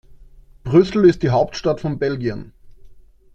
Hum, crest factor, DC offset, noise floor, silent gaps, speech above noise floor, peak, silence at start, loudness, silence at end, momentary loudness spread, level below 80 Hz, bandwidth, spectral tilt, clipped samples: none; 18 dB; under 0.1%; -45 dBFS; none; 28 dB; -2 dBFS; 0.65 s; -18 LUFS; 0.45 s; 12 LU; -44 dBFS; 7.6 kHz; -7.5 dB/octave; under 0.1%